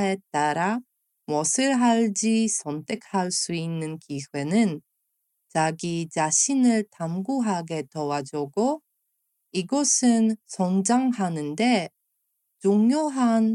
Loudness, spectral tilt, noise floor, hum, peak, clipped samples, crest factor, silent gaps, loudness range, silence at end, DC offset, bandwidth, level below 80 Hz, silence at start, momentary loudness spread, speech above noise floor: -24 LUFS; -4 dB/octave; -76 dBFS; none; -8 dBFS; under 0.1%; 16 dB; none; 4 LU; 0 s; under 0.1%; 11.5 kHz; -76 dBFS; 0 s; 11 LU; 53 dB